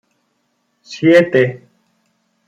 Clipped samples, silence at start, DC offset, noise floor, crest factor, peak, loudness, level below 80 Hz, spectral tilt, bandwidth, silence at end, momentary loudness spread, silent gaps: under 0.1%; 0.9 s; under 0.1%; -66 dBFS; 16 dB; -2 dBFS; -13 LUFS; -62 dBFS; -6.5 dB/octave; 9.2 kHz; 0.9 s; 24 LU; none